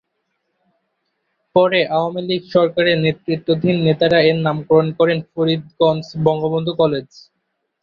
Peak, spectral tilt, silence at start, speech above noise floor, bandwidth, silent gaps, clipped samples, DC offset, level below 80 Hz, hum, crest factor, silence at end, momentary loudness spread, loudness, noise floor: -2 dBFS; -8 dB/octave; 1.55 s; 55 dB; 6.6 kHz; none; under 0.1%; under 0.1%; -56 dBFS; none; 16 dB; 0.8 s; 6 LU; -17 LUFS; -72 dBFS